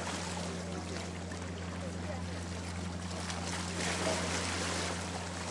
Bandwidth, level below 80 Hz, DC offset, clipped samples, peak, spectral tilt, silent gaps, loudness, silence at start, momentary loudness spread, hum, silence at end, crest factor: 11.5 kHz; -60 dBFS; under 0.1%; under 0.1%; -20 dBFS; -3.5 dB/octave; none; -37 LUFS; 0 s; 7 LU; none; 0 s; 18 dB